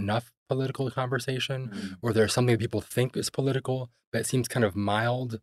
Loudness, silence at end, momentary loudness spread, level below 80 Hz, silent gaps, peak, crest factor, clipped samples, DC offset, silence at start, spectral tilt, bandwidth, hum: -28 LUFS; 0.05 s; 8 LU; -64 dBFS; 0.37-0.46 s, 4.07-4.12 s; -10 dBFS; 18 dB; under 0.1%; under 0.1%; 0 s; -5.5 dB/octave; 14 kHz; none